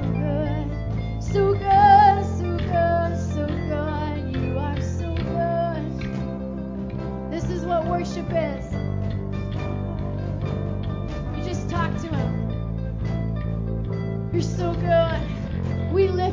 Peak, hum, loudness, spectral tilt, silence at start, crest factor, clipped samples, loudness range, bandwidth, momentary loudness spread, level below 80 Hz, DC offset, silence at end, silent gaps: -4 dBFS; none; -24 LUFS; -7.5 dB/octave; 0 s; 18 dB; under 0.1%; 8 LU; 7.6 kHz; 8 LU; -34 dBFS; under 0.1%; 0 s; none